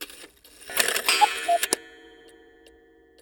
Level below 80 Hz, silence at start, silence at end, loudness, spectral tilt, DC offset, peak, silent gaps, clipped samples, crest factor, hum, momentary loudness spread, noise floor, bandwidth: -66 dBFS; 0 s; 1.25 s; -23 LUFS; 1 dB/octave; under 0.1%; -2 dBFS; none; under 0.1%; 26 dB; none; 22 LU; -56 dBFS; over 20 kHz